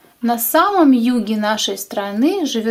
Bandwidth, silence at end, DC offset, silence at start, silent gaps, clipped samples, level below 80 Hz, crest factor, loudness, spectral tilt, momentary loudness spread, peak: 16.5 kHz; 0 s; under 0.1%; 0.2 s; none; under 0.1%; -60 dBFS; 14 dB; -16 LUFS; -3.5 dB/octave; 8 LU; -2 dBFS